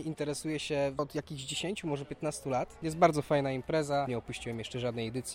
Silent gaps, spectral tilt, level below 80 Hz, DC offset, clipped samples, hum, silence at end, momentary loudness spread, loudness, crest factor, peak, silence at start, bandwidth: none; -5 dB/octave; -58 dBFS; under 0.1%; under 0.1%; none; 0 s; 10 LU; -33 LUFS; 24 dB; -10 dBFS; 0 s; 16.5 kHz